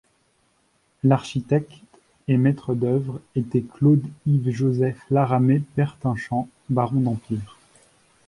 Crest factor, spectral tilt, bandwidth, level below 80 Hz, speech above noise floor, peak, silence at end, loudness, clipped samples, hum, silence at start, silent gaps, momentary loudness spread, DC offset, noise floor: 18 dB; -9 dB/octave; 11 kHz; -56 dBFS; 44 dB; -4 dBFS; 0.8 s; -23 LUFS; under 0.1%; none; 1.05 s; none; 9 LU; under 0.1%; -65 dBFS